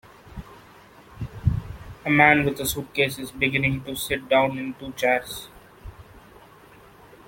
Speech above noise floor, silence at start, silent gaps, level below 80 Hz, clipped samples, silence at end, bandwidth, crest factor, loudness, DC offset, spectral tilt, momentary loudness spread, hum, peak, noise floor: 27 dB; 0.25 s; none; -46 dBFS; under 0.1%; 1.1 s; 17 kHz; 24 dB; -23 LUFS; under 0.1%; -5 dB/octave; 25 LU; none; -2 dBFS; -50 dBFS